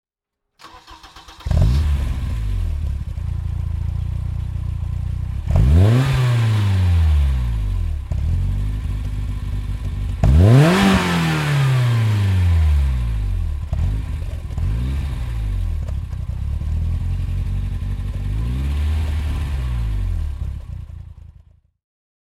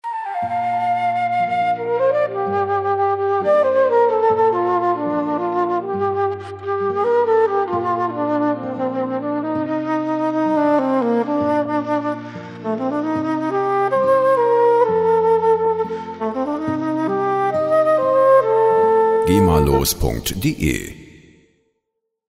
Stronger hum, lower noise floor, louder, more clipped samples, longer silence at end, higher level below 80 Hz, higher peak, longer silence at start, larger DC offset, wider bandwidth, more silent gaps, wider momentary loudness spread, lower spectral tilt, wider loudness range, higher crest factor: neither; first, -80 dBFS vs -76 dBFS; about the same, -20 LUFS vs -18 LUFS; neither; second, 1.05 s vs 1.25 s; first, -22 dBFS vs -38 dBFS; about the same, 0 dBFS vs -2 dBFS; first, 0.65 s vs 0.05 s; neither; second, 13.5 kHz vs 16 kHz; neither; first, 12 LU vs 8 LU; about the same, -7 dB/octave vs -6 dB/octave; first, 9 LU vs 4 LU; about the same, 18 dB vs 16 dB